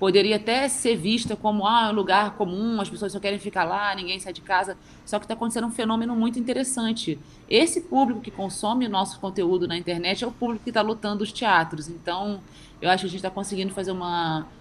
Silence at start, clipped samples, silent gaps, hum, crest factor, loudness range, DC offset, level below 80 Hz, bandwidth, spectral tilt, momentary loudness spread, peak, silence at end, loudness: 0 s; under 0.1%; none; none; 22 dB; 3 LU; under 0.1%; -56 dBFS; 12.5 kHz; -4 dB/octave; 10 LU; -2 dBFS; 0 s; -25 LUFS